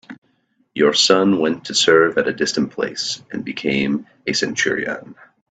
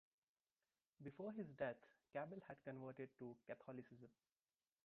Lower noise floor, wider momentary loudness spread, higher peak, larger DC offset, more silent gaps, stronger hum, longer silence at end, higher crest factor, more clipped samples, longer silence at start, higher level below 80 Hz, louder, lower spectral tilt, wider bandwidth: second, -64 dBFS vs under -90 dBFS; about the same, 12 LU vs 12 LU; first, 0 dBFS vs -32 dBFS; neither; first, 0.18-0.22 s vs none; neither; second, 0.4 s vs 0.75 s; about the same, 20 dB vs 22 dB; neither; second, 0.1 s vs 1 s; first, -60 dBFS vs -88 dBFS; first, -18 LUFS vs -54 LUFS; second, -3 dB/octave vs -6.5 dB/octave; first, 9.2 kHz vs 4.5 kHz